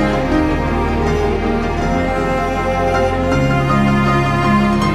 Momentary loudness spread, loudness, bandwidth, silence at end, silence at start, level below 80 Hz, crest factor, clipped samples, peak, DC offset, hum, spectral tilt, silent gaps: 4 LU; -16 LUFS; 13 kHz; 0 s; 0 s; -24 dBFS; 12 dB; under 0.1%; -2 dBFS; under 0.1%; none; -7 dB/octave; none